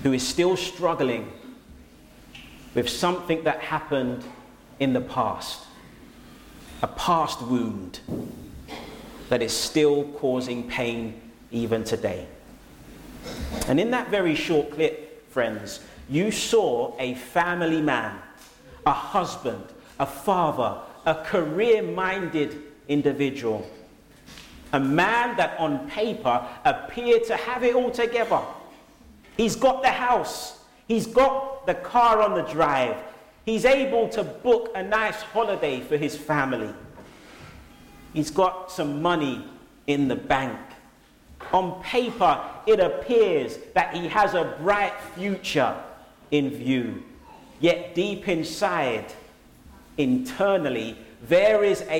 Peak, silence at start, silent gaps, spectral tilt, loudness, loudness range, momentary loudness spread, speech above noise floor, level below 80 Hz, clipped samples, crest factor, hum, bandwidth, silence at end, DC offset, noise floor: -6 dBFS; 0 s; none; -5 dB/octave; -24 LUFS; 6 LU; 17 LU; 30 dB; -50 dBFS; under 0.1%; 20 dB; none; 17 kHz; 0 s; under 0.1%; -54 dBFS